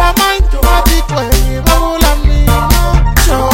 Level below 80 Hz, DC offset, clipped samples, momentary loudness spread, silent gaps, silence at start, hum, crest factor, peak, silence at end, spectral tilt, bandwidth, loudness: -10 dBFS; under 0.1%; 0.4%; 2 LU; none; 0 s; none; 8 dB; 0 dBFS; 0 s; -4.5 dB/octave; 17 kHz; -11 LUFS